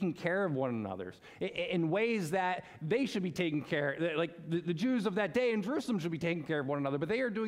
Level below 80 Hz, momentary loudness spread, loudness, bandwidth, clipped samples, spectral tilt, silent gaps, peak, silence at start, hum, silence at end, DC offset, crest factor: -72 dBFS; 6 LU; -34 LUFS; 15.5 kHz; under 0.1%; -6.5 dB/octave; none; -16 dBFS; 0 s; none; 0 s; under 0.1%; 18 dB